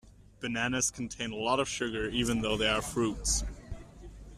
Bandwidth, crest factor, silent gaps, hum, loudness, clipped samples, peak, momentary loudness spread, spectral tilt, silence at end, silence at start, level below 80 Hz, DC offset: 14 kHz; 20 dB; none; none; -31 LUFS; under 0.1%; -14 dBFS; 18 LU; -3 dB/octave; 0 s; 0.05 s; -44 dBFS; under 0.1%